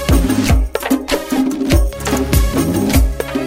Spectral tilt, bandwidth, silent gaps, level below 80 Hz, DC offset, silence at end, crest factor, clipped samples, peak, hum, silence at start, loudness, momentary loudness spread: -5.5 dB/octave; 16.5 kHz; none; -18 dBFS; under 0.1%; 0 s; 14 dB; under 0.1%; 0 dBFS; none; 0 s; -16 LUFS; 4 LU